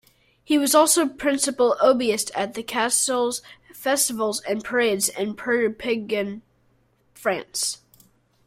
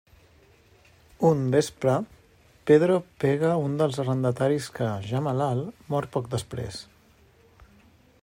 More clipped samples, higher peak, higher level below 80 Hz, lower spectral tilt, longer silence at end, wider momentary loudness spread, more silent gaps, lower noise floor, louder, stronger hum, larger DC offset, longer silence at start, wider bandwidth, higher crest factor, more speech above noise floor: neither; about the same, -4 dBFS vs -6 dBFS; about the same, -62 dBFS vs -60 dBFS; second, -2 dB/octave vs -7 dB/octave; second, 0.7 s vs 1.4 s; about the same, 10 LU vs 12 LU; neither; first, -63 dBFS vs -58 dBFS; first, -22 LUFS vs -25 LUFS; neither; neither; second, 0.5 s vs 1.2 s; about the same, 16 kHz vs 16 kHz; about the same, 20 dB vs 20 dB; first, 41 dB vs 34 dB